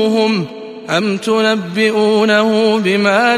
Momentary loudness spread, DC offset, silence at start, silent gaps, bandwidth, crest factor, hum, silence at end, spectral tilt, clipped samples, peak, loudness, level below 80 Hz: 7 LU; under 0.1%; 0 s; none; 13.5 kHz; 12 dB; none; 0 s; -5 dB/octave; under 0.1%; -2 dBFS; -14 LUFS; -62 dBFS